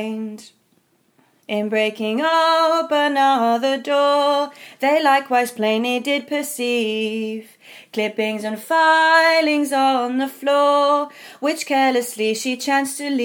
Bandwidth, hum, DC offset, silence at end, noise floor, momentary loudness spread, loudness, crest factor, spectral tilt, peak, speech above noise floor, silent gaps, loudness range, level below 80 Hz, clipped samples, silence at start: over 20 kHz; none; under 0.1%; 0 s; -62 dBFS; 10 LU; -18 LUFS; 16 dB; -3 dB/octave; -2 dBFS; 43 dB; none; 4 LU; -78 dBFS; under 0.1%; 0 s